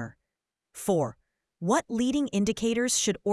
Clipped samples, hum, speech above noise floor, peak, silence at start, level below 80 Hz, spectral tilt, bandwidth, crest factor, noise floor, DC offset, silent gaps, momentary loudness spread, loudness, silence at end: under 0.1%; none; 60 dB; -12 dBFS; 0 s; -58 dBFS; -4 dB/octave; 12 kHz; 18 dB; -87 dBFS; under 0.1%; none; 10 LU; -27 LUFS; 0 s